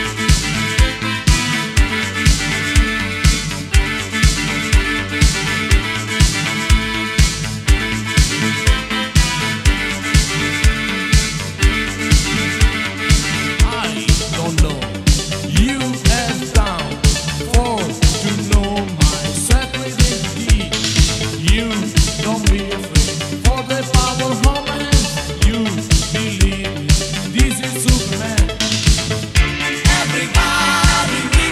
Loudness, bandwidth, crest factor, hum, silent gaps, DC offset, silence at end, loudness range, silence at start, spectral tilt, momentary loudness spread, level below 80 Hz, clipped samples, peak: -16 LUFS; 15.5 kHz; 16 dB; none; none; under 0.1%; 0 s; 1 LU; 0 s; -4 dB/octave; 3 LU; -18 dBFS; under 0.1%; 0 dBFS